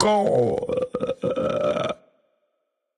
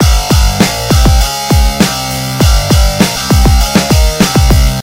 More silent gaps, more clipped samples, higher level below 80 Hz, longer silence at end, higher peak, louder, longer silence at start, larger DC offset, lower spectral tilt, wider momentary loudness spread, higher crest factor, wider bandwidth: neither; second, under 0.1% vs 0.5%; second, -56 dBFS vs -12 dBFS; first, 1.05 s vs 0 s; second, -4 dBFS vs 0 dBFS; second, -24 LUFS vs -10 LUFS; about the same, 0 s vs 0 s; neither; first, -6 dB/octave vs -4.5 dB/octave; first, 8 LU vs 3 LU; first, 20 dB vs 8 dB; second, 10.5 kHz vs 16.5 kHz